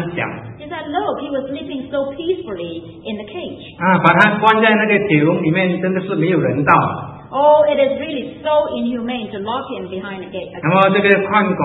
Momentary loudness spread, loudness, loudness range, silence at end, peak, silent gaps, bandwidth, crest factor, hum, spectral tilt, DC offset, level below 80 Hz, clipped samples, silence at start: 16 LU; -16 LUFS; 9 LU; 0 s; 0 dBFS; none; 8 kHz; 16 dB; none; -8 dB/octave; under 0.1%; -54 dBFS; under 0.1%; 0 s